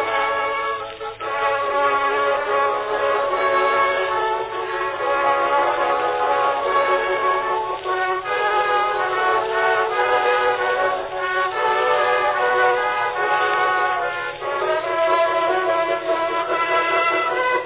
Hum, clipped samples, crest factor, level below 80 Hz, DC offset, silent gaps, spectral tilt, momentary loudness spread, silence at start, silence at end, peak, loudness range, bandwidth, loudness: none; under 0.1%; 16 dB; -56 dBFS; under 0.1%; none; -6.5 dB/octave; 5 LU; 0 s; 0 s; -4 dBFS; 1 LU; 4 kHz; -20 LUFS